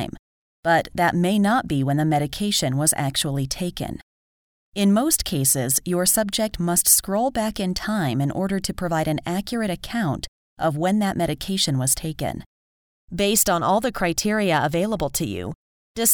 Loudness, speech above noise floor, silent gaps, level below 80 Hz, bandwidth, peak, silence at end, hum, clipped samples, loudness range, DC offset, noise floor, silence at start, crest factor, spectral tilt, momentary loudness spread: -21 LUFS; over 68 dB; 0.19-0.63 s, 4.03-4.72 s, 10.28-10.56 s, 12.46-13.08 s, 15.55-15.95 s; -44 dBFS; over 20 kHz; -4 dBFS; 0 s; none; under 0.1%; 5 LU; under 0.1%; under -90 dBFS; 0 s; 18 dB; -4 dB/octave; 10 LU